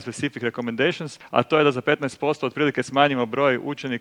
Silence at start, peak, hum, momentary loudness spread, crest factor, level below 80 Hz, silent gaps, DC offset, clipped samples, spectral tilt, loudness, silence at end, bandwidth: 0 s; -2 dBFS; none; 8 LU; 22 dB; -66 dBFS; none; under 0.1%; under 0.1%; -5.5 dB/octave; -23 LUFS; 0 s; 11.5 kHz